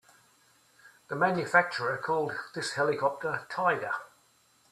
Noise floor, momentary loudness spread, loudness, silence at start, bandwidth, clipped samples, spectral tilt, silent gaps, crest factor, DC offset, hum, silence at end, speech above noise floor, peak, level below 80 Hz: -65 dBFS; 10 LU; -29 LUFS; 0.85 s; 14 kHz; under 0.1%; -4.5 dB/octave; none; 22 dB; under 0.1%; none; 0.65 s; 36 dB; -8 dBFS; -76 dBFS